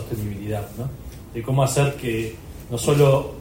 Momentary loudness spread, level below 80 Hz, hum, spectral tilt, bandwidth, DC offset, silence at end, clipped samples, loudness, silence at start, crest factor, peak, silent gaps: 16 LU; -42 dBFS; none; -6 dB/octave; 16.5 kHz; under 0.1%; 0 s; under 0.1%; -22 LUFS; 0 s; 18 dB; -4 dBFS; none